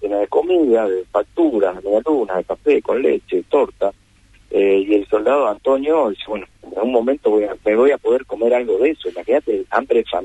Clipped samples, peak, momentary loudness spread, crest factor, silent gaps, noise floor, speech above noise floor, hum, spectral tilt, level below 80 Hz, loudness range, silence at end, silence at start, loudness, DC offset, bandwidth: under 0.1%; -2 dBFS; 7 LU; 14 dB; none; -51 dBFS; 34 dB; none; -6 dB/octave; -52 dBFS; 1 LU; 0 s; 0 s; -18 LUFS; under 0.1%; 8.8 kHz